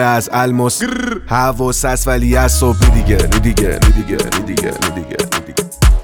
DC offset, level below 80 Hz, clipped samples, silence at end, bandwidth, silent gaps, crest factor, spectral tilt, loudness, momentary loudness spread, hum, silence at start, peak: under 0.1%; -16 dBFS; under 0.1%; 0 s; 18.5 kHz; none; 12 dB; -4.5 dB/octave; -14 LUFS; 7 LU; none; 0 s; 0 dBFS